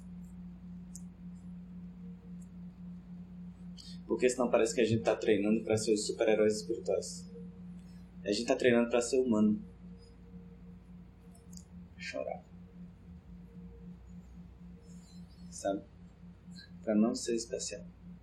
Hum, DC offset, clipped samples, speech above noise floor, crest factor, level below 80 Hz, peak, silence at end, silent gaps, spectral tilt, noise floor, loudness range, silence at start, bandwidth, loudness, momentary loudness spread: none; under 0.1%; under 0.1%; 23 dB; 22 dB; -60 dBFS; -14 dBFS; 0 s; none; -5 dB/octave; -54 dBFS; 17 LU; 0 s; 12.5 kHz; -32 LUFS; 24 LU